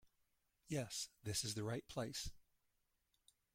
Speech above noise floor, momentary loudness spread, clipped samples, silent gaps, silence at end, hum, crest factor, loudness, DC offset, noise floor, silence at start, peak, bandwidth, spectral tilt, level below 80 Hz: 39 dB; 5 LU; under 0.1%; none; 1.15 s; none; 18 dB; -45 LUFS; under 0.1%; -84 dBFS; 0.05 s; -30 dBFS; 16.5 kHz; -3.5 dB/octave; -66 dBFS